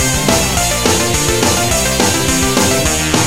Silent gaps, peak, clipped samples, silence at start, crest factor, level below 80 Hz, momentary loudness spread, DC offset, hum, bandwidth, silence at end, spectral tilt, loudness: none; 0 dBFS; under 0.1%; 0 s; 14 dB; -26 dBFS; 1 LU; 2%; none; 16.5 kHz; 0 s; -3 dB/octave; -12 LUFS